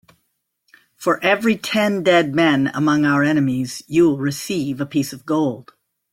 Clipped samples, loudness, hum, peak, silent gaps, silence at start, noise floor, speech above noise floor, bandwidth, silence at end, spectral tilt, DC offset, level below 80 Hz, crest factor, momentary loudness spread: under 0.1%; -18 LUFS; none; -2 dBFS; none; 1 s; -72 dBFS; 54 dB; 16.5 kHz; 0.5 s; -5.5 dB/octave; under 0.1%; -58 dBFS; 18 dB; 8 LU